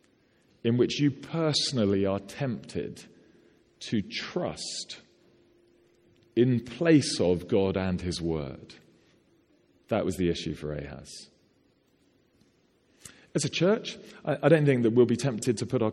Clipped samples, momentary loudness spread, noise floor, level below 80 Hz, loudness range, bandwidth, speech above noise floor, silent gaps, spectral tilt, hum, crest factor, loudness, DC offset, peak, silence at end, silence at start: under 0.1%; 17 LU; -67 dBFS; -56 dBFS; 9 LU; 13.5 kHz; 40 dB; none; -5.5 dB/octave; none; 22 dB; -28 LUFS; under 0.1%; -8 dBFS; 0 s; 0.65 s